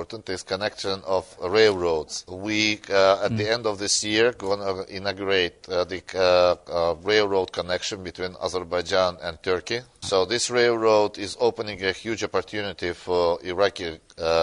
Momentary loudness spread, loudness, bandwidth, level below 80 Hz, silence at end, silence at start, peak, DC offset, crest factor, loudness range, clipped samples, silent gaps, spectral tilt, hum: 10 LU; -24 LUFS; 11 kHz; -54 dBFS; 0 s; 0 s; -4 dBFS; under 0.1%; 20 dB; 3 LU; under 0.1%; none; -3 dB/octave; none